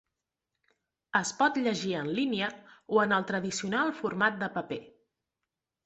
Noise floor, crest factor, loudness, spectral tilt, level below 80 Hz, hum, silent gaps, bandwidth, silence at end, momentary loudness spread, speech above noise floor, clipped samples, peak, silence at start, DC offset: -88 dBFS; 22 dB; -30 LUFS; -4 dB/octave; -72 dBFS; none; none; 8.4 kHz; 0.95 s; 8 LU; 58 dB; under 0.1%; -10 dBFS; 1.15 s; under 0.1%